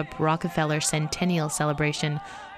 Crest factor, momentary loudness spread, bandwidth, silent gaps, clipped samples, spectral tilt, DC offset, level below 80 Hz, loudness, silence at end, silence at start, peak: 16 dB; 4 LU; 13.5 kHz; none; under 0.1%; -4.5 dB/octave; under 0.1%; -52 dBFS; -26 LUFS; 0 s; 0 s; -10 dBFS